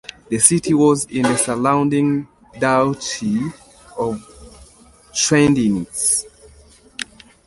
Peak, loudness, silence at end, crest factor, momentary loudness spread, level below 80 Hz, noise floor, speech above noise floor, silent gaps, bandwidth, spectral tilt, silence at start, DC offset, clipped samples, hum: 0 dBFS; -17 LUFS; 0.45 s; 20 dB; 17 LU; -50 dBFS; -48 dBFS; 31 dB; none; 12 kHz; -4 dB/octave; 0.3 s; under 0.1%; under 0.1%; none